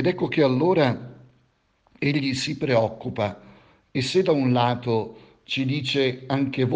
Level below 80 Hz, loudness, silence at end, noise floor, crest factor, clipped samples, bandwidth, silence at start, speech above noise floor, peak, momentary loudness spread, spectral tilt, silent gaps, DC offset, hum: -60 dBFS; -23 LUFS; 0 s; -65 dBFS; 18 dB; under 0.1%; 9.6 kHz; 0 s; 42 dB; -6 dBFS; 9 LU; -6 dB/octave; none; under 0.1%; none